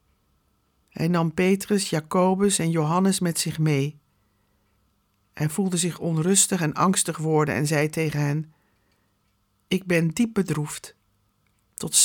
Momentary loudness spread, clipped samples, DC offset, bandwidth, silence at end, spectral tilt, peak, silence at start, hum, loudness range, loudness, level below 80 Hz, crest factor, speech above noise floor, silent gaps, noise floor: 9 LU; under 0.1%; under 0.1%; 19.5 kHz; 0 s; -4.5 dB/octave; -4 dBFS; 0.95 s; none; 5 LU; -23 LUFS; -60 dBFS; 20 dB; 46 dB; none; -69 dBFS